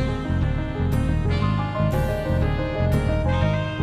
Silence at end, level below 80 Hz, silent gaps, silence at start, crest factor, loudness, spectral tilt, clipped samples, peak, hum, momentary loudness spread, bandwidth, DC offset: 0 s; -28 dBFS; none; 0 s; 14 dB; -23 LUFS; -8 dB/octave; under 0.1%; -8 dBFS; none; 3 LU; 15 kHz; under 0.1%